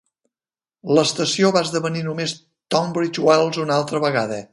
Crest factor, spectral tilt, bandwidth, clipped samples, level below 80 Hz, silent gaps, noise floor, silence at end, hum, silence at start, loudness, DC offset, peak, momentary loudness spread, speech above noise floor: 18 dB; -4.5 dB/octave; 11.5 kHz; under 0.1%; -66 dBFS; none; under -90 dBFS; 0.05 s; none; 0.85 s; -20 LUFS; under 0.1%; -2 dBFS; 8 LU; over 71 dB